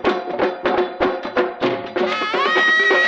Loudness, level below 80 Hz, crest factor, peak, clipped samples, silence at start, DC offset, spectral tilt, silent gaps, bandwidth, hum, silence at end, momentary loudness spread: -18 LUFS; -52 dBFS; 14 dB; -4 dBFS; under 0.1%; 0 s; under 0.1%; -4 dB/octave; none; 8 kHz; none; 0 s; 8 LU